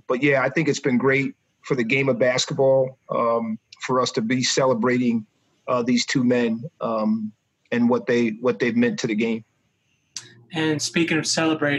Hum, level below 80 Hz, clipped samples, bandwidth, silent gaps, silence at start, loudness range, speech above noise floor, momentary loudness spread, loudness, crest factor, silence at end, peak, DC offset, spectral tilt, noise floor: none; -68 dBFS; under 0.1%; 12 kHz; none; 0.1 s; 3 LU; 47 dB; 10 LU; -22 LUFS; 16 dB; 0 s; -6 dBFS; under 0.1%; -4.5 dB/octave; -68 dBFS